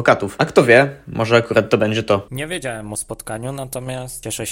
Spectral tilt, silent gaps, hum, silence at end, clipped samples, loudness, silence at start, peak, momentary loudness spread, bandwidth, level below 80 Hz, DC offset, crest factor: -5 dB/octave; none; none; 0 s; under 0.1%; -18 LUFS; 0 s; 0 dBFS; 15 LU; 17 kHz; -48 dBFS; under 0.1%; 18 dB